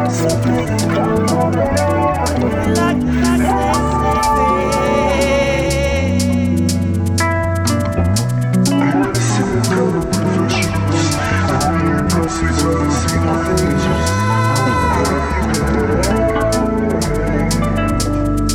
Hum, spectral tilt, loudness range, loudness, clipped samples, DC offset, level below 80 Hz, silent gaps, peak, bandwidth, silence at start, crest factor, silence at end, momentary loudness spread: none; -5.5 dB/octave; 1 LU; -15 LUFS; under 0.1%; under 0.1%; -26 dBFS; none; -2 dBFS; 20 kHz; 0 s; 12 dB; 0 s; 2 LU